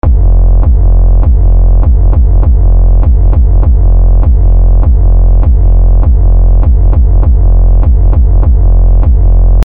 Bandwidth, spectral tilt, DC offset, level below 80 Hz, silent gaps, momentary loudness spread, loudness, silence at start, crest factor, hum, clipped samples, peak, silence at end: 1.5 kHz; -11.5 dB/octave; 10%; -4 dBFS; none; 0 LU; -9 LUFS; 0 s; 4 dB; none; under 0.1%; 0 dBFS; 0 s